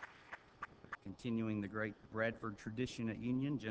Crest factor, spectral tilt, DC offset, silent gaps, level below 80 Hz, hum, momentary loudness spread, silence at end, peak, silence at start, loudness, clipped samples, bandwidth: 18 dB; -6.5 dB/octave; under 0.1%; none; -68 dBFS; none; 13 LU; 0 s; -24 dBFS; 0 s; -42 LUFS; under 0.1%; 8 kHz